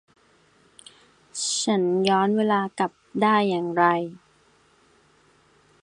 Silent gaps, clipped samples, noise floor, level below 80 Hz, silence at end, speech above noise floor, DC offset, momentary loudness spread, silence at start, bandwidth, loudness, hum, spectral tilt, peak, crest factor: none; under 0.1%; -60 dBFS; -70 dBFS; 1.65 s; 38 dB; under 0.1%; 8 LU; 1.35 s; 11 kHz; -23 LUFS; none; -4 dB/octave; -4 dBFS; 20 dB